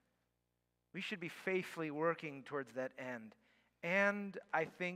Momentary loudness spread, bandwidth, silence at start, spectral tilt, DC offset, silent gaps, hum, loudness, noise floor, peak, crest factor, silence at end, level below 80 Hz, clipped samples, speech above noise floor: 13 LU; 16 kHz; 0.95 s; -5.5 dB/octave; under 0.1%; none; 60 Hz at -75 dBFS; -40 LUFS; -85 dBFS; -20 dBFS; 22 dB; 0 s; -90 dBFS; under 0.1%; 45 dB